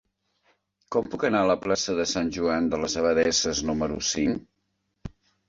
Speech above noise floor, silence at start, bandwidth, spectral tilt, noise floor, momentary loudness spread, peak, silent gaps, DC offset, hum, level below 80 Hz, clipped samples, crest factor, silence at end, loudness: 51 dB; 0.9 s; 7.8 kHz; -3.5 dB/octave; -76 dBFS; 12 LU; -8 dBFS; none; under 0.1%; none; -50 dBFS; under 0.1%; 18 dB; 0.4 s; -25 LUFS